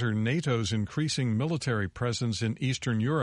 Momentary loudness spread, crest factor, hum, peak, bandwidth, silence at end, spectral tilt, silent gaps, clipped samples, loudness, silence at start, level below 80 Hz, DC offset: 3 LU; 14 dB; none; -14 dBFS; 11.5 kHz; 0 s; -5.5 dB/octave; none; under 0.1%; -29 LUFS; 0 s; -56 dBFS; under 0.1%